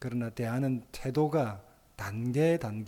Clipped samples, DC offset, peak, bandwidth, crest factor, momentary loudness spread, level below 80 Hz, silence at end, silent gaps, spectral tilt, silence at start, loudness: under 0.1%; under 0.1%; -16 dBFS; 18 kHz; 14 dB; 10 LU; -58 dBFS; 0 s; none; -7.5 dB/octave; 0 s; -31 LUFS